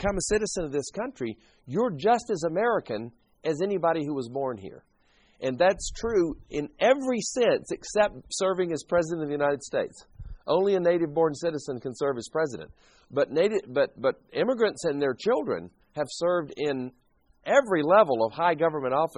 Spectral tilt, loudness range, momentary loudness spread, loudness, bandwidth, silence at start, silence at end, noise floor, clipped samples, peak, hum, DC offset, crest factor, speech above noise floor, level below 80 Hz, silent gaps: -4.5 dB/octave; 3 LU; 11 LU; -27 LUFS; 10.5 kHz; 0 s; 0.1 s; -64 dBFS; under 0.1%; -6 dBFS; none; under 0.1%; 20 dB; 38 dB; -52 dBFS; none